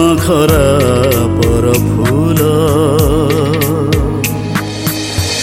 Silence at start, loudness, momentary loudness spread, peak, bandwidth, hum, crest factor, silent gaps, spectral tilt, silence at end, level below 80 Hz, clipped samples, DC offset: 0 s; -12 LUFS; 6 LU; 0 dBFS; 16.5 kHz; none; 10 dB; none; -5.5 dB/octave; 0 s; -24 dBFS; under 0.1%; under 0.1%